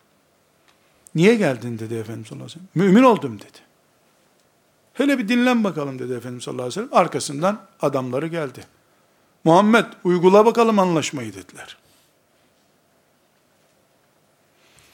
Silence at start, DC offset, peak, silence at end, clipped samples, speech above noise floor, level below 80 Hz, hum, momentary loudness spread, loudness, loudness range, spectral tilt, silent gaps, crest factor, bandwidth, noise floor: 1.15 s; under 0.1%; 0 dBFS; 3.2 s; under 0.1%; 42 dB; -72 dBFS; none; 20 LU; -19 LUFS; 6 LU; -6 dB/octave; none; 20 dB; 16.5 kHz; -61 dBFS